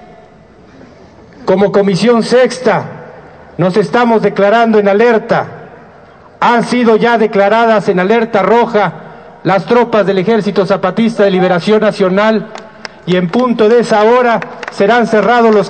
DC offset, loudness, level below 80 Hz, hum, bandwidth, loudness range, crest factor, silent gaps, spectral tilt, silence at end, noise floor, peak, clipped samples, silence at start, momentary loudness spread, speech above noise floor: 0.2%; -10 LUFS; -52 dBFS; none; 9.2 kHz; 2 LU; 10 dB; none; -6.5 dB/octave; 0 s; -39 dBFS; 0 dBFS; under 0.1%; 1.4 s; 8 LU; 30 dB